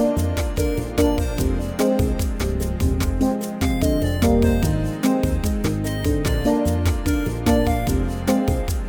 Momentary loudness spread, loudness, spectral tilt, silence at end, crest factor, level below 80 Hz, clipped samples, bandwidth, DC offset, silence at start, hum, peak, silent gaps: 4 LU; -21 LUFS; -6.5 dB/octave; 0 s; 16 dB; -26 dBFS; under 0.1%; 20 kHz; under 0.1%; 0 s; none; -4 dBFS; none